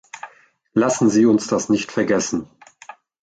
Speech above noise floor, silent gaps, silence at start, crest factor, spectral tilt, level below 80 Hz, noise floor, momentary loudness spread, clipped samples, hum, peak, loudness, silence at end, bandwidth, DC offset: 35 dB; none; 0.15 s; 16 dB; -5 dB/octave; -58 dBFS; -53 dBFS; 20 LU; under 0.1%; none; -4 dBFS; -19 LUFS; 0.3 s; 9.2 kHz; under 0.1%